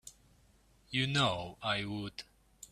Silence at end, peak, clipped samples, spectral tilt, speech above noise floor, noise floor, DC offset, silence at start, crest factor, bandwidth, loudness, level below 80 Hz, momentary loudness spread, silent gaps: 0.05 s; -16 dBFS; under 0.1%; -4.5 dB/octave; 32 dB; -66 dBFS; under 0.1%; 0.05 s; 22 dB; 14.5 kHz; -34 LUFS; -64 dBFS; 24 LU; none